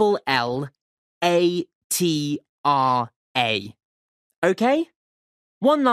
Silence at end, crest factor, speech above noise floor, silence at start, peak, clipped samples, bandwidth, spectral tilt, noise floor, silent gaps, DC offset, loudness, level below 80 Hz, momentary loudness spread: 0 s; 18 dB; over 69 dB; 0 s; -4 dBFS; under 0.1%; 15.5 kHz; -4.5 dB/octave; under -90 dBFS; 0.81-1.21 s, 1.75-1.90 s, 2.49-2.64 s, 3.16-3.35 s, 3.85-4.30 s, 4.36-4.42 s, 4.96-5.61 s; under 0.1%; -22 LUFS; -66 dBFS; 10 LU